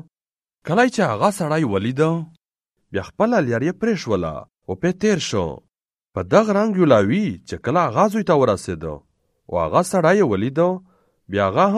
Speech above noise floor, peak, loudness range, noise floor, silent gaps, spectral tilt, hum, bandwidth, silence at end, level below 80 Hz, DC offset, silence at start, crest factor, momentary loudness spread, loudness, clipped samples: over 71 dB; 0 dBFS; 4 LU; under -90 dBFS; none; -6 dB/octave; none; 13 kHz; 0 s; -50 dBFS; under 0.1%; 0.65 s; 18 dB; 14 LU; -19 LUFS; under 0.1%